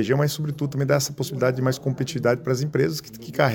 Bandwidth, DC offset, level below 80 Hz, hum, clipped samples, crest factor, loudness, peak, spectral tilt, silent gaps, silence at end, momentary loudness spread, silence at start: 17 kHz; under 0.1%; -58 dBFS; none; under 0.1%; 18 dB; -24 LUFS; -4 dBFS; -5.5 dB/octave; none; 0 s; 5 LU; 0 s